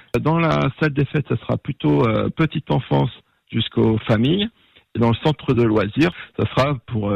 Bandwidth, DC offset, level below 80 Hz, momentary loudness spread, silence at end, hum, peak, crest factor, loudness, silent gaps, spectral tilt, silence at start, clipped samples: 8.2 kHz; under 0.1%; -46 dBFS; 7 LU; 0 s; none; -8 dBFS; 12 dB; -20 LUFS; none; -8 dB/octave; 0.15 s; under 0.1%